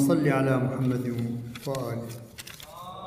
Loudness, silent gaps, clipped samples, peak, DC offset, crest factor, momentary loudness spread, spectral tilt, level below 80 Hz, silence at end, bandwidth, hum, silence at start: -28 LUFS; none; under 0.1%; -10 dBFS; under 0.1%; 18 dB; 18 LU; -7 dB/octave; -60 dBFS; 0 s; 16 kHz; none; 0 s